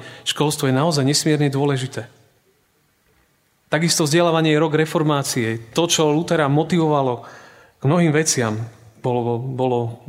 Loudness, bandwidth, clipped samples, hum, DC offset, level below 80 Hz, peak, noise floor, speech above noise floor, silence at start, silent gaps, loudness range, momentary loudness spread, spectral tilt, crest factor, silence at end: -19 LUFS; 16 kHz; under 0.1%; none; under 0.1%; -62 dBFS; -2 dBFS; -62 dBFS; 44 dB; 0 s; none; 4 LU; 8 LU; -4.5 dB/octave; 18 dB; 0.1 s